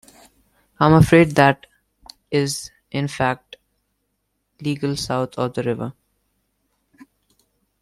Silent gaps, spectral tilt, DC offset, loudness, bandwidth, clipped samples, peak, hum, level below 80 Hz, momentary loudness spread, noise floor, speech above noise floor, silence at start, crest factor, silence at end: none; -6 dB/octave; under 0.1%; -19 LUFS; 13.5 kHz; under 0.1%; -2 dBFS; none; -46 dBFS; 16 LU; -73 dBFS; 55 dB; 0.8 s; 20 dB; 1.9 s